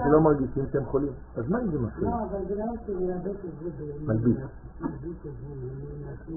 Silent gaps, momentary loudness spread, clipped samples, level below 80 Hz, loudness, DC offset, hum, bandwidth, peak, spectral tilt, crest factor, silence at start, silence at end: none; 13 LU; under 0.1%; -44 dBFS; -29 LUFS; under 0.1%; none; 1.9 kHz; -8 dBFS; -4 dB/octave; 20 dB; 0 s; 0 s